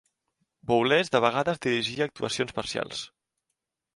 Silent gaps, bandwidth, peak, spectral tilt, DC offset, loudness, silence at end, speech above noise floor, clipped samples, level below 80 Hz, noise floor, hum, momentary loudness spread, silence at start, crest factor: none; 11.5 kHz; -8 dBFS; -4 dB/octave; under 0.1%; -26 LUFS; 0.9 s; 57 dB; under 0.1%; -62 dBFS; -83 dBFS; none; 13 LU; 0.65 s; 22 dB